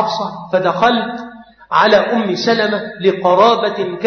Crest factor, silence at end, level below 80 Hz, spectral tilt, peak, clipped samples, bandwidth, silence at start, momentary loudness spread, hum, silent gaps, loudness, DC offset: 14 dB; 0 s; -58 dBFS; -5 dB/octave; 0 dBFS; under 0.1%; 6.6 kHz; 0 s; 10 LU; none; none; -14 LUFS; under 0.1%